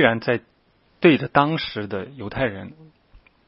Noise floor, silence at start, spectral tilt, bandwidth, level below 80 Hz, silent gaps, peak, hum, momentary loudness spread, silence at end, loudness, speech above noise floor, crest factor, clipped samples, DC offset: -61 dBFS; 0 s; -10.5 dB/octave; 5.8 kHz; -52 dBFS; none; 0 dBFS; none; 14 LU; 0.75 s; -22 LUFS; 40 dB; 22 dB; under 0.1%; under 0.1%